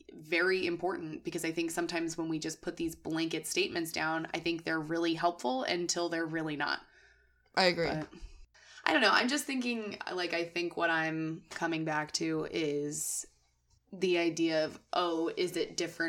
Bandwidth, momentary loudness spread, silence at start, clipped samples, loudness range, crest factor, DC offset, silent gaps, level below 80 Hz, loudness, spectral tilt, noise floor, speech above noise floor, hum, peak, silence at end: 17 kHz; 9 LU; 0.1 s; under 0.1%; 3 LU; 26 dB; under 0.1%; none; -64 dBFS; -33 LUFS; -3.5 dB/octave; -71 dBFS; 38 dB; none; -8 dBFS; 0 s